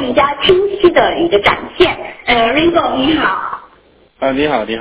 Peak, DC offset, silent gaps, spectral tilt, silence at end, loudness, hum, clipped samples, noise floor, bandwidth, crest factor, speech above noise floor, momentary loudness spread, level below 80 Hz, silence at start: 0 dBFS; under 0.1%; none; -8.5 dB/octave; 0 s; -13 LUFS; none; under 0.1%; -48 dBFS; 4 kHz; 14 dB; 35 dB; 9 LU; -38 dBFS; 0 s